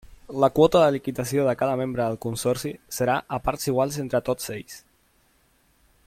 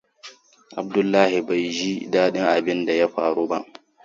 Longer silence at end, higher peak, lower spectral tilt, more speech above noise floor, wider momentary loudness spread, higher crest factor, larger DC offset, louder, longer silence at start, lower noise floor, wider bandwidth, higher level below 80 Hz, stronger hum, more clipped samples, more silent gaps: first, 1.25 s vs 0.4 s; about the same, -4 dBFS vs -2 dBFS; about the same, -5.5 dB/octave vs -5 dB/octave; first, 40 dB vs 26 dB; first, 14 LU vs 8 LU; about the same, 20 dB vs 20 dB; neither; second, -24 LUFS vs -21 LUFS; second, 0.1 s vs 0.25 s; first, -63 dBFS vs -46 dBFS; first, 16.5 kHz vs 7.8 kHz; first, -50 dBFS vs -68 dBFS; neither; neither; neither